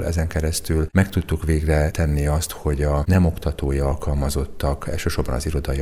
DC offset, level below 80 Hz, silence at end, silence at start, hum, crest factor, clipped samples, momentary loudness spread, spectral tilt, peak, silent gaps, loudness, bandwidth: under 0.1%; -26 dBFS; 0 s; 0 s; none; 16 dB; under 0.1%; 6 LU; -6 dB/octave; -4 dBFS; none; -22 LUFS; 15.5 kHz